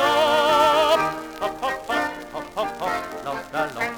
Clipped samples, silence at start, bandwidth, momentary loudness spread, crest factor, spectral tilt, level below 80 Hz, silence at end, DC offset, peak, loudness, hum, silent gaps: under 0.1%; 0 s; over 20 kHz; 13 LU; 16 dB; -3 dB/octave; -52 dBFS; 0 s; under 0.1%; -6 dBFS; -22 LUFS; none; none